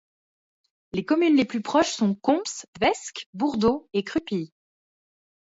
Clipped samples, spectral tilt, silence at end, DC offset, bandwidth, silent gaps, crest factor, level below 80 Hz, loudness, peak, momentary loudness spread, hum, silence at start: under 0.1%; -4.5 dB/octave; 1.15 s; under 0.1%; 8 kHz; 2.68-2.73 s, 3.26-3.33 s; 18 dB; -58 dBFS; -24 LUFS; -8 dBFS; 12 LU; none; 0.95 s